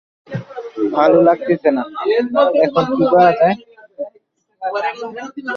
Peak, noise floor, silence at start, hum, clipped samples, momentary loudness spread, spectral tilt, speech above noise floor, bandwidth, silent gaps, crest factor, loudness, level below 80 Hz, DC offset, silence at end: -2 dBFS; -57 dBFS; 0.3 s; none; under 0.1%; 18 LU; -7.5 dB/octave; 42 dB; 6.8 kHz; none; 14 dB; -15 LUFS; -60 dBFS; under 0.1%; 0 s